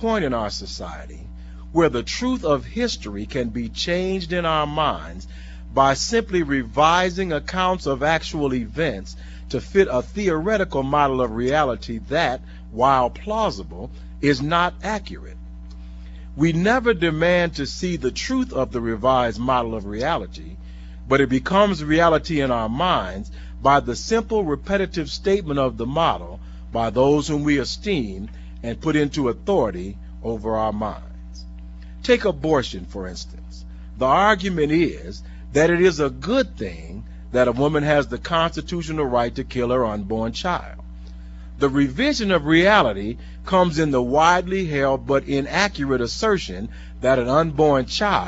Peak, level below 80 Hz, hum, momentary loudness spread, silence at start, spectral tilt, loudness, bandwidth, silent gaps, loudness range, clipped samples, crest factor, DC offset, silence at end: -2 dBFS; -36 dBFS; none; 19 LU; 0 s; -5.5 dB/octave; -21 LUFS; 8 kHz; none; 5 LU; under 0.1%; 20 dB; under 0.1%; 0 s